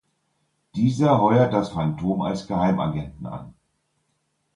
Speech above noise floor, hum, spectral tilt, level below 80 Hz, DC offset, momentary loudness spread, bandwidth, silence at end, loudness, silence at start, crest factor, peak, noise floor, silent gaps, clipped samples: 51 dB; none; -8 dB/octave; -50 dBFS; under 0.1%; 17 LU; 11 kHz; 1.05 s; -22 LUFS; 0.75 s; 18 dB; -6 dBFS; -72 dBFS; none; under 0.1%